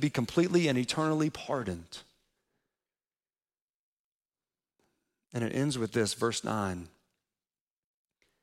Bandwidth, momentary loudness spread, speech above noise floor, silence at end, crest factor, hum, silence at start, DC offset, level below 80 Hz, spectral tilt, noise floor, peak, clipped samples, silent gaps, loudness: 16 kHz; 15 LU; over 60 dB; 1.55 s; 20 dB; none; 0 s; under 0.1%; -66 dBFS; -5 dB/octave; under -90 dBFS; -14 dBFS; under 0.1%; 3.61-4.19 s; -31 LUFS